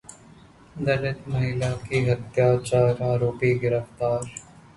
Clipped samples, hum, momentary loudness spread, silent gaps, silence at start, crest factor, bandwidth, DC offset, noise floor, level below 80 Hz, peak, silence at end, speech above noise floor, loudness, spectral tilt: under 0.1%; none; 8 LU; none; 0.1 s; 16 dB; 11.5 kHz; under 0.1%; -50 dBFS; -50 dBFS; -8 dBFS; 0.15 s; 27 dB; -24 LUFS; -7 dB/octave